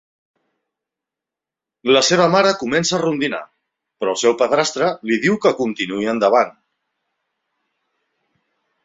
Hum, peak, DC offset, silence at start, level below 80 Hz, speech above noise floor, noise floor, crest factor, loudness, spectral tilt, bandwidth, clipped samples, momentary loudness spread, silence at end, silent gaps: none; -2 dBFS; under 0.1%; 1.85 s; -62 dBFS; 70 dB; -87 dBFS; 18 dB; -17 LUFS; -3.5 dB/octave; 8.2 kHz; under 0.1%; 9 LU; 2.35 s; none